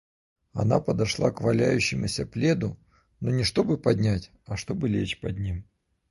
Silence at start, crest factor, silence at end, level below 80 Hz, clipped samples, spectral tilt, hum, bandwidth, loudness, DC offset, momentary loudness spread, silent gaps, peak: 0.55 s; 20 dB; 0.5 s; -46 dBFS; under 0.1%; -6 dB/octave; none; 11.5 kHz; -26 LUFS; under 0.1%; 10 LU; none; -6 dBFS